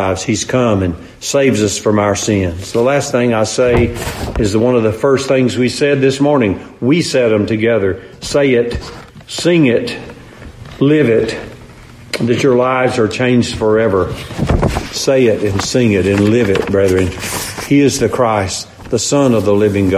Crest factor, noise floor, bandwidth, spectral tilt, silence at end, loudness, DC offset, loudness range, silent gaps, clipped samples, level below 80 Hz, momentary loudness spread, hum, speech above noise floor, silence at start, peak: 14 dB; -36 dBFS; 15.5 kHz; -5.5 dB/octave; 0 s; -13 LUFS; under 0.1%; 2 LU; none; under 0.1%; -32 dBFS; 9 LU; none; 23 dB; 0 s; 0 dBFS